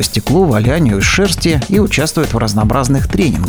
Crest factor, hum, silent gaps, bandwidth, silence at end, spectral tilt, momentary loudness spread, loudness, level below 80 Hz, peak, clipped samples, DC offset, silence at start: 12 dB; none; none; over 20 kHz; 0 s; -5 dB/octave; 3 LU; -13 LUFS; -24 dBFS; 0 dBFS; under 0.1%; under 0.1%; 0 s